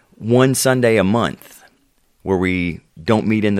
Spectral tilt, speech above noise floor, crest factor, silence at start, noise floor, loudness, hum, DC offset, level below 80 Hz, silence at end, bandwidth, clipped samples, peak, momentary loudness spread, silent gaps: -5.5 dB/octave; 43 dB; 16 dB; 0.2 s; -59 dBFS; -17 LUFS; none; under 0.1%; -52 dBFS; 0 s; 16.5 kHz; under 0.1%; 0 dBFS; 12 LU; none